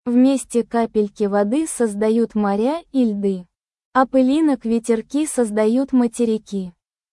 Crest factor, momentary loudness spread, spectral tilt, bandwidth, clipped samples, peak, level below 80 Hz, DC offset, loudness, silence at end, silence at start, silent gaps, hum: 16 dB; 7 LU; -5.5 dB/octave; 12 kHz; under 0.1%; -4 dBFS; -58 dBFS; under 0.1%; -19 LUFS; 0.4 s; 0.05 s; 3.85-3.92 s; none